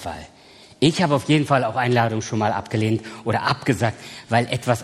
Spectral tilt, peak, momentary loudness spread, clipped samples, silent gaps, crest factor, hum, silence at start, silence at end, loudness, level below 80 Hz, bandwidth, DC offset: -5.5 dB/octave; 0 dBFS; 7 LU; under 0.1%; none; 20 dB; none; 0 s; 0 s; -21 LUFS; -56 dBFS; 13 kHz; under 0.1%